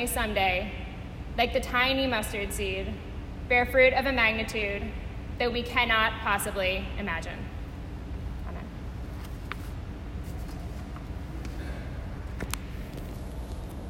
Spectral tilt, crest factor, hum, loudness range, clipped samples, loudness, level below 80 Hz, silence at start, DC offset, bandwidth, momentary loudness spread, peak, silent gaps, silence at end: -4 dB/octave; 20 dB; none; 13 LU; under 0.1%; -29 LUFS; -38 dBFS; 0 s; under 0.1%; 16 kHz; 16 LU; -10 dBFS; none; 0 s